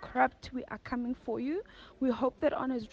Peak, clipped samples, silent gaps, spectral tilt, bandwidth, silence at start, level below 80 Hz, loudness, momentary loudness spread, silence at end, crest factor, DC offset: -14 dBFS; under 0.1%; none; -6.5 dB/octave; 7.2 kHz; 0 s; -60 dBFS; -34 LUFS; 10 LU; 0.05 s; 20 dB; under 0.1%